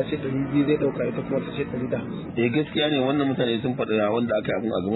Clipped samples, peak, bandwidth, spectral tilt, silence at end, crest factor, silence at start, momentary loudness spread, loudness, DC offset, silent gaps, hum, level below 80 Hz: under 0.1%; -8 dBFS; 4.1 kHz; -10.5 dB/octave; 0 s; 16 dB; 0 s; 6 LU; -24 LUFS; under 0.1%; none; none; -54 dBFS